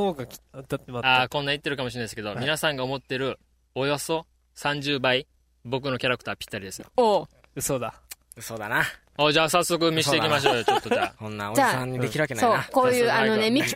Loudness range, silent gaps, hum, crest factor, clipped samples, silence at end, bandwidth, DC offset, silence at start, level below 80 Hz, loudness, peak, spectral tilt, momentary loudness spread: 5 LU; none; none; 18 dB; under 0.1%; 0 s; 16 kHz; under 0.1%; 0 s; -56 dBFS; -24 LUFS; -6 dBFS; -4 dB/octave; 14 LU